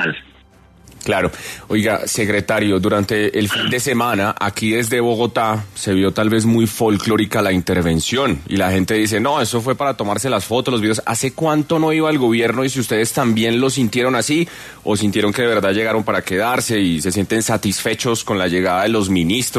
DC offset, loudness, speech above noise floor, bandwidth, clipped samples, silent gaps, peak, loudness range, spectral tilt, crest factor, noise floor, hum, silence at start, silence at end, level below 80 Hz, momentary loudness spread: under 0.1%; -17 LUFS; 30 dB; 14 kHz; under 0.1%; none; -2 dBFS; 1 LU; -4.5 dB/octave; 14 dB; -47 dBFS; none; 0 s; 0 s; -46 dBFS; 3 LU